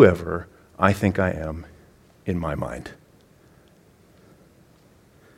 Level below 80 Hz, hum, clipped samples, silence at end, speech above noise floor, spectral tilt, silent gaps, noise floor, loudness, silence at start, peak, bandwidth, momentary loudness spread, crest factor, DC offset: -46 dBFS; none; under 0.1%; 2.45 s; 34 dB; -7.5 dB/octave; none; -55 dBFS; -24 LUFS; 0 s; 0 dBFS; 16 kHz; 20 LU; 24 dB; under 0.1%